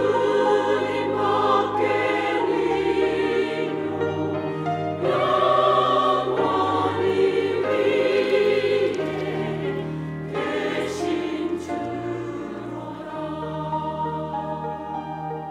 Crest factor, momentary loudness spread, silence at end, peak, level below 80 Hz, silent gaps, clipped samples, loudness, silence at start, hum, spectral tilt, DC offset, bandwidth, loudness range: 16 dB; 11 LU; 0 s; -8 dBFS; -58 dBFS; none; under 0.1%; -23 LUFS; 0 s; none; -6 dB/octave; under 0.1%; 11 kHz; 8 LU